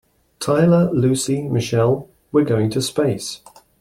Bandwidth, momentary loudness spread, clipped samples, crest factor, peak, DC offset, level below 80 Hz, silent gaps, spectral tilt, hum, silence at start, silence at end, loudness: 14.5 kHz; 11 LU; under 0.1%; 16 dB; -4 dBFS; under 0.1%; -52 dBFS; none; -6 dB/octave; none; 0.4 s; 0.45 s; -19 LUFS